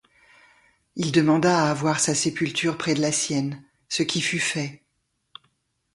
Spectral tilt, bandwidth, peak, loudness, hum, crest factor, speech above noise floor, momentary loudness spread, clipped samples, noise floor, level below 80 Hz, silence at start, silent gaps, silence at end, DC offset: -4 dB/octave; 11.5 kHz; -6 dBFS; -23 LUFS; none; 18 dB; 51 dB; 11 LU; under 0.1%; -74 dBFS; -62 dBFS; 0.95 s; none; 1.2 s; under 0.1%